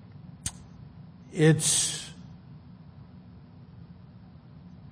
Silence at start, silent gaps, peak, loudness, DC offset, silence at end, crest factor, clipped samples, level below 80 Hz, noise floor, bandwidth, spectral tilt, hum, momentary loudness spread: 0.25 s; none; -8 dBFS; -25 LUFS; under 0.1%; 0.25 s; 22 dB; under 0.1%; -58 dBFS; -49 dBFS; 10.5 kHz; -4 dB/octave; none; 28 LU